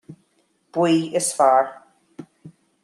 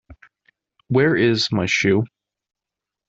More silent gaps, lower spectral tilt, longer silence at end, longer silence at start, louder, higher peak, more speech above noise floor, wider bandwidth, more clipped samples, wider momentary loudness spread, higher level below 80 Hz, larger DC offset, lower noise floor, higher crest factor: neither; about the same, -4.5 dB/octave vs -5.5 dB/octave; second, 0.35 s vs 1 s; about the same, 0.1 s vs 0.1 s; about the same, -20 LUFS vs -18 LUFS; about the same, -4 dBFS vs -4 dBFS; second, 47 dB vs 68 dB; first, 13 kHz vs 8 kHz; neither; first, 13 LU vs 6 LU; second, -74 dBFS vs -56 dBFS; neither; second, -65 dBFS vs -86 dBFS; about the same, 18 dB vs 18 dB